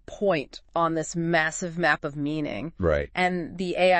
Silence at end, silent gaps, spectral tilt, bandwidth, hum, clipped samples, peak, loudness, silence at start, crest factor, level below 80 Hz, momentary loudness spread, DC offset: 0 s; none; -5 dB/octave; 8.8 kHz; none; under 0.1%; -8 dBFS; -26 LUFS; 0.1 s; 18 dB; -48 dBFS; 7 LU; under 0.1%